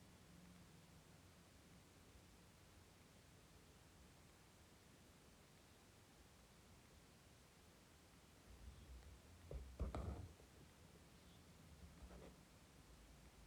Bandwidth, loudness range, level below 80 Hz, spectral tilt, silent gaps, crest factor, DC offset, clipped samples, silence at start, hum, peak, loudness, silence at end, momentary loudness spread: 19.5 kHz; 10 LU; -64 dBFS; -5 dB/octave; none; 24 dB; under 0.1%; under 0.1%; 0 s; none; -36 dBFS; -62 LUFS; 0 s; 10 LU